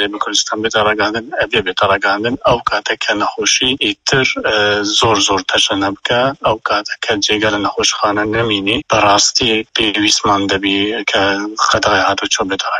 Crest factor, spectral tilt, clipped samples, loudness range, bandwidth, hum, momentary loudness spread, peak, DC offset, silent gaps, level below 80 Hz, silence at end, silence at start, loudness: 14 dB; -2.5 dB/octave; under 0.1%; 2 LU; 11 kHz; none; 5 LU; 0 dBFS; under 0.1%; none; -44 dBFS; 0 s; 0 s; -13 LUFS